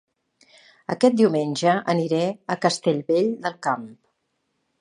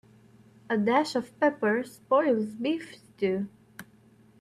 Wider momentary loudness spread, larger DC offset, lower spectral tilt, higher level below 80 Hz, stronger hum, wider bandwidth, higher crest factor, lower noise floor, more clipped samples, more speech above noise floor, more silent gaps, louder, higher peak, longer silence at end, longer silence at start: second, 10 LU vs 20 LU; neither; about the same, -5.5 dB/octave vs -6 dB/octave; about the same, -74 dBFS vs -74 dBFS; neither; second, 11 kHz vs 14 kHz; about the same, 20 dB vs 18 dB; first, -74 dBFS vs -58 dBFS; neither; first, 52 dB vs 31 dB; neither; first, -22 LUFS vs -28 LUFS; first, -4 dBFS vs -10 dBFS; first, 0.85 s vs 0.55 s; first, 0.9 s vs 0.7 s